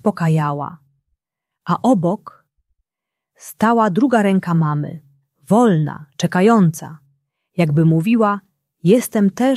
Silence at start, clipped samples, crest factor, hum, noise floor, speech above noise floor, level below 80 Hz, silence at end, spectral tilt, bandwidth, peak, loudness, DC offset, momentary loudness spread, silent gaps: 0.05 s; under 0.1%; 16 dB; none; -84 dBFS; 68 dB; -62 dBFS; 0 s; -7.5 dB/octave; 14 kHz; -2 dBFS; -17 LUFS; under 0.1%; 14 LU; none